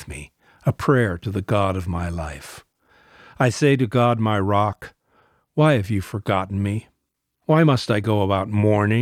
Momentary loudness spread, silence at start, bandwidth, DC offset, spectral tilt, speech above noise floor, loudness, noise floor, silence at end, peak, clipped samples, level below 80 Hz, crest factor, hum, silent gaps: 13 LU; 0 s; 14.5 kHz; under 0.1%; -7 dB/octave; 56 dB; -21 LUFS; -76 dBFS; 0 s; -4 dBFS; under 0.1%; -46 dBFS; 18 dB; none; none